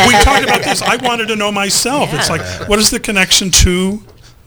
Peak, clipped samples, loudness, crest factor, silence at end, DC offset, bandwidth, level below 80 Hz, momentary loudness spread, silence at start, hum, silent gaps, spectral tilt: 0 dBFS; 0.2%; -12 LUFS; 12 dB; 0.45 s; under 0.1%; over 20 kHz; -24 dBFS; 8 LU; 0 s; none; none; -2.5 dB/octave